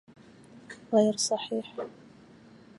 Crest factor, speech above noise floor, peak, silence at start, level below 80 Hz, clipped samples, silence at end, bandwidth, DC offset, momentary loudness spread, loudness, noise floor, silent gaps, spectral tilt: 22 dB; 26 dB; -10 dBFS; 0.55 s; -74 dBFS; under 0.1%; 0.9 s; 11.5 kHz; under 0.1%; 21 LU; -28 LUFS; -54 dBFS; none; -4 dB/octave